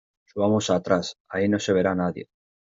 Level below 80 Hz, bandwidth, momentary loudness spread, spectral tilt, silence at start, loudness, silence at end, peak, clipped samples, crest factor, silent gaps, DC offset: -64 dBFS; 7.8 kHz; 9 LU; -5 dB/octave; 0.35 s; -24 LUFS; 0.5 s; -6 dBFS; under 0.1%; 18 dB; 1.20-1.25 s; under 0.1%